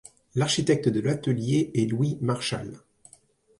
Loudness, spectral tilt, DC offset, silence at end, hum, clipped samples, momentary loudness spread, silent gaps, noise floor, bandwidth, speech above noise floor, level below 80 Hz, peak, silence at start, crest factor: -26 LUFS; -5.5 dB/octave; under 0.1%; 0.8 s; none; under 0.1%; 9 LU; none; -59 dBFS; 11.5 kHz; 34 dB; -60 dBFS; -8 dBFS; 0.35 s; 18 dB